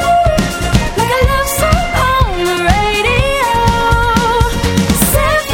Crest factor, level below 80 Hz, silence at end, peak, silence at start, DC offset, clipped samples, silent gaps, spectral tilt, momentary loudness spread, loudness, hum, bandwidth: 12 dB; -20 dBFS; 0 s; 0 dBFS; 0 s; under 0.1%; under 0.1%; none; -4.5 dB/octave; 3 LU; -12 LUFS; none; 18.5 kHz